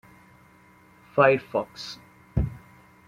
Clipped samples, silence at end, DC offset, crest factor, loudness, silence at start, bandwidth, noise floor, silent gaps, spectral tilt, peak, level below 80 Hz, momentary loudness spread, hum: under 0.1%; 0.5 s; under 0.1%; 24 dB; -25 LUFS; 1.15 s; 14.5 kHz; -55 dBFS; none; -6.5 dB/octave; -4 dBFS; -42 dBFS; 18 LU; none